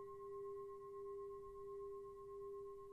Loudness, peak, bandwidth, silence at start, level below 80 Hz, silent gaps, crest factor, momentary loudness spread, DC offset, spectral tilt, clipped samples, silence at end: -53 LUFS; -44 dBFS; 13 kHz; 0 s; -72 dBFS; none; 8 dB; 3 LU; under 0.1%; -7.5 dB/octave; under 0.1%; 0 s